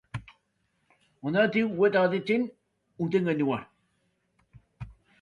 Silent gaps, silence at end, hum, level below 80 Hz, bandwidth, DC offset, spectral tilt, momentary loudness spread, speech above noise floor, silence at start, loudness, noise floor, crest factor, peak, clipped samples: none; 0.3 s; none; -62 dBFS; 9.8 kHz; under 0.1%; -8 dB/octave; 23 LU; 49 dB; 0.15 s; -27 LUFS; -74 dBFS; 20 dB; -10 dBFS; under 0.1%